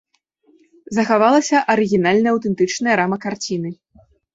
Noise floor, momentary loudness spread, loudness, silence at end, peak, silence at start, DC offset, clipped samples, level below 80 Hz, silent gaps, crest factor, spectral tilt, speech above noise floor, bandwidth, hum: -60 dBFS; 10 LU; -17 LUFS; 0.6 s; -2 dBFS; 0.9 s; under 0.1%; under 0.1%; -60 dBFS; none; 16 dB; -5 dB/octave; 43 dB; 8 kHz; none